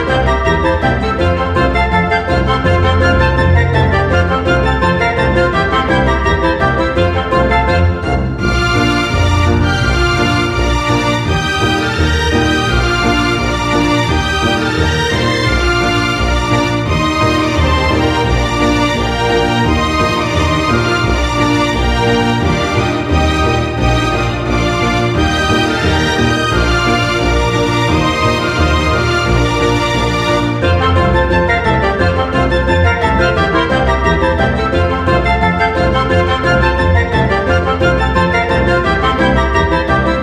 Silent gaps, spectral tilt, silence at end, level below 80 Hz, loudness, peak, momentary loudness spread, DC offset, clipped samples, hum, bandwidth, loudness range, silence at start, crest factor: none; -5.5 dB/octave; 0 s; -22 dBFS; -13 LUFS; 0 dBFS; 2 LU; under 0.1%; under 0.1%; none; 13.5 kHz; 1 LU; 0 s; 12 dB